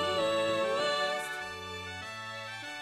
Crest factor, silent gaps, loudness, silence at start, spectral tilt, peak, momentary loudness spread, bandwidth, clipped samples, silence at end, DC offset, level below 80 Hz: 14 dB; none; -33 LUFS; 0 s; -3 dB/octave; -20 dBFS; 10 LU; 13.5 kHz; under 0.1%; 0 s; under 0.1%; -70 dBFS